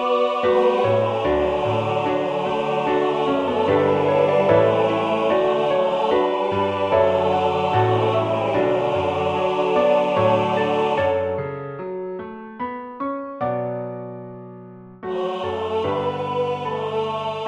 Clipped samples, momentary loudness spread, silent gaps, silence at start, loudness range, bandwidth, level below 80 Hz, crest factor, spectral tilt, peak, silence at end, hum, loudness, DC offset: under 0.1%; 12 LU; none; 0 s; 9 LU; 9.2 kHz; -52 dBFS; 18 dB; -7 dB/octave; -4 dBFS; 0 s; none; -21 LUFS; under 0.1%